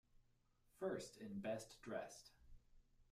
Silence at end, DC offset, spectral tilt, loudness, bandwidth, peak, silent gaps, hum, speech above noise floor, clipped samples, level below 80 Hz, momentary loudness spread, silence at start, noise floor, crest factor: 0.05 s; under 0.1%; -5 dB/octave; -50 LUFS; 15.5 kHz; -32 dBFS; none; none; 29 dB; under 0.1%; -72 dBFS; 11 LU; 0.15 s; -78 dBFS; 20 dB